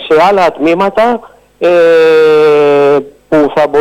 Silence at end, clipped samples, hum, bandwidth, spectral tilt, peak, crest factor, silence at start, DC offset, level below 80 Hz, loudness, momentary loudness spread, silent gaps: 0 s; under 0.1%; none; 11.5 kHz; -6 dB/octave; -2 dBFS; 6 dB; 0 s; under 0.1%; -48 dBFS; -8 LUFS; 7 LU; none